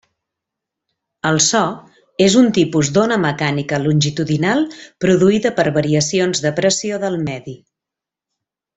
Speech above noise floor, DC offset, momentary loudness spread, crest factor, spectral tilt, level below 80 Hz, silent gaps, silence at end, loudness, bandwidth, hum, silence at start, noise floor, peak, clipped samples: 70 dB; under 0.1%; 10 LU; 16 dB; -4.5 dB/octave; -52 dBFS; none; 1.2 s; -16 LUFS; 8.4 kHz; none; 1.25 s; -86 dBFS; -2 dBFS; under 0.1%